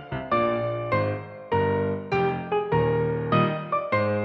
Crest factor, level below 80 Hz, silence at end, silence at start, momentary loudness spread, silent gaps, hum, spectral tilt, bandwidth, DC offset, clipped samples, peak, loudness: 14 dB; -50 dBFS; 0 s; 0 s; 5 LU; none; none; -9 dB/octave; 6.2 kHz; under 0.1%; under 0.1%; -10 dBFS; -25 LUFS